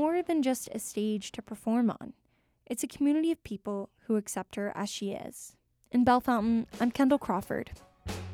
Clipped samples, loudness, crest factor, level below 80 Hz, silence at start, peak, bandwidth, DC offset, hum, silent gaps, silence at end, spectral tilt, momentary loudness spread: under 0.1%; -31 LUFS; 18 dB; -58 dBFS; 0 s; -12 dBFS; 17 kHz; under 0.1%; none; none; 0 s; -5 dB/octave; 15 LU